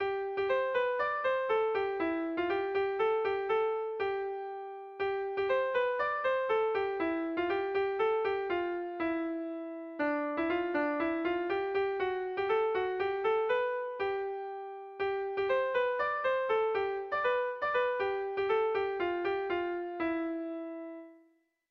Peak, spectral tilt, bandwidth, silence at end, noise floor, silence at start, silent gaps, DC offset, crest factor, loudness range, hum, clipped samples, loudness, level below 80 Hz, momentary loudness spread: -20 dBFS; -6 dB/octave; 6 kHz; 0.55 s; -69 dBFS; 0 s; none; under 0.1%; 12 dB; 2 LU; none; under 0.1%; -32 LUFS; -68 dBFS; 7 LU